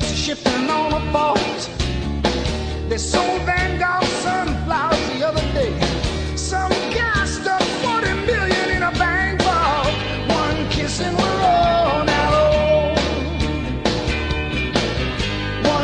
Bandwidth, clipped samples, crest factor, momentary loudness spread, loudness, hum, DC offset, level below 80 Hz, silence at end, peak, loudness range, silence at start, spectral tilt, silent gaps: 10.5 kHz; under 0.1%; 16 dB; 6 LU; -19 LUFS; none; under 0.1%; -30 dBFS; 0 s; -2 dBFS; 3 LU; 0 s; -4.5 dB/octave; none